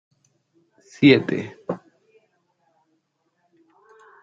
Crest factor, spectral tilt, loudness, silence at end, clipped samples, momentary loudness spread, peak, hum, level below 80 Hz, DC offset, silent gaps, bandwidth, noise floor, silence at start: 24 dB; -7 dB/octave; -20 LUFS; 2.45 s; under 0.1%; 17 LU; -2 dBFS; none; -66 dBFS; under 0.1%; none; 7.4 kHz; -71 dBFS; 1 s